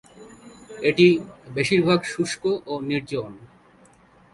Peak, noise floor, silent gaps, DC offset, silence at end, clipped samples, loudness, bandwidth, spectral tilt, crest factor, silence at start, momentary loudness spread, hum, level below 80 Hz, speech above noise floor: -4 dBFS; -54 dBFS; none; under 0.1%; 0.9 s; under 0.1%; -22 LUFS; 11.5 kHz; -5.5 dB/octave; 20 dB; 0.2 s; 14 LU; none; -60 dBFS; 33 dB